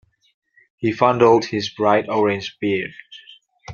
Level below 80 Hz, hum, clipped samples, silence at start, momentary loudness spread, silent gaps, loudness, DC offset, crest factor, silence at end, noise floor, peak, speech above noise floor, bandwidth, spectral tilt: -60 dBFS; none; under 0.1%; 0.8 s; 10 LU; none; -19 LUFS; under 0.1%; 18 dB; 0 s; -48 dBFS; -2 dBFS; 30 dB; 7.2 kHz; -6 dB/octave